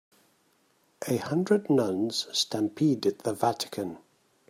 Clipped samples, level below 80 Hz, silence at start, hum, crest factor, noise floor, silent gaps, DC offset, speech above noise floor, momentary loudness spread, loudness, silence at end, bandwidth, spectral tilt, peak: under 0.1%; -74 dBFS; 1 s; none; 20 dB; -68 dBFS; none; under 0.1%; 40 dB; 11 LU; -28 LUFS; 0.5 s; 16 kHz; -5 dB/octave; -10 dBFS